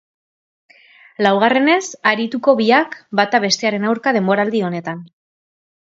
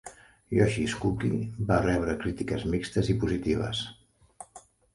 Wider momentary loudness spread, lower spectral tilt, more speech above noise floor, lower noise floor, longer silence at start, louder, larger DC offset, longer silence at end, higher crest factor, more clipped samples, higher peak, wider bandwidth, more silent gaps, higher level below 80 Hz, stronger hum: second, 8 LU vs 21 LU; second, -4.5 dB/octave vs -6.5 dB/octave; first, over 74 dB vs 27 dB; first, under -90 dBFS vs -54 dBFS; first, 1.2 s vs 0.05 s; first, -16 LUFS vs -28 LUFS; neither; first, 0.9 s vs 0.35 s; about the same, 18 dB vs 20 dB; neither; first, 0 dBFS vs -8 dBFS; second, 8 kHz vs 11.5 kHz; neither; second, -66 dBFS vs -44 dBFS; neither